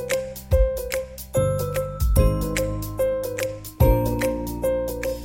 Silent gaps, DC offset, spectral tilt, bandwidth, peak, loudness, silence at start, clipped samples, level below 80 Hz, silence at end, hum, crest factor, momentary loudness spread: none; under 0.1%; -6 dB/octave; 17 kHz; -6 dBFS; -24 LUFS; 0 s; under 0.1%; -28 dBFS; 0 s; none; 18 dB; 7 LU